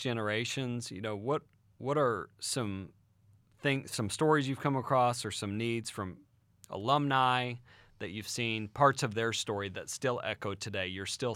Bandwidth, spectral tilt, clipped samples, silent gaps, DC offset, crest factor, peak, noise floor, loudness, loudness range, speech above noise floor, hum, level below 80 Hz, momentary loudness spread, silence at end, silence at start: 16.5 kHz; -4.5 dB/octave; under 0.1%; none; under 0.1%; 22 dB; -10 dBFS; -65 dBFS; -33 LUFS; 4 LU; 33 dB; none; -70 dBFS; 12 LU; 0 s; 0 s